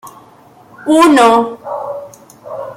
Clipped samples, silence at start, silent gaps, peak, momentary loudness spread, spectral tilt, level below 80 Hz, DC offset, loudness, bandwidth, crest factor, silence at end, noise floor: under 0.1%; 0.05 s; none; 0 dBFS; 20 LU; -3.5 dB/octave; -58 dBFS; under 0.1%; -11 LUFS; 16 kHz; 14 dB; 0.05 s; -43 dBFS